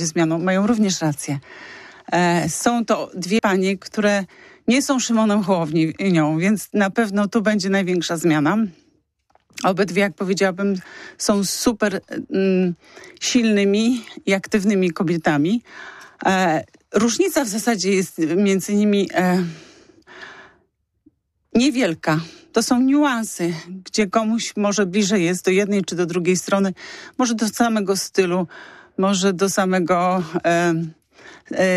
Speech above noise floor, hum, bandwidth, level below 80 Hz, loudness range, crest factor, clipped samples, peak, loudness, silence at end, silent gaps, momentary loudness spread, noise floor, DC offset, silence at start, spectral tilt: 46 dB; none; 15 kHz; -58 dBFS; 2 LU; 14 dB; under 0.1%; -6 dBFS; -20 LUFS; 0 s; none; 9 LU; -65 dBFS; under 0.1%; 0 s; -5 dB/octave